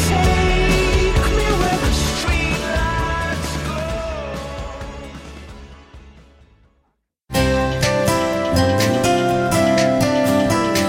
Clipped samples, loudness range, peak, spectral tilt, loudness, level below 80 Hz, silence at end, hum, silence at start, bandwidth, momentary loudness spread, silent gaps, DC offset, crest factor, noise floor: under 0.1%; 13 LU; -4 dBFS; -5 dB/octave; -18 LUFS; -26 dBFS; 0 s; none; 0 s; 16.5 kHz; 14 LU; none; under 0.1%; 16 dB; -67 dBFS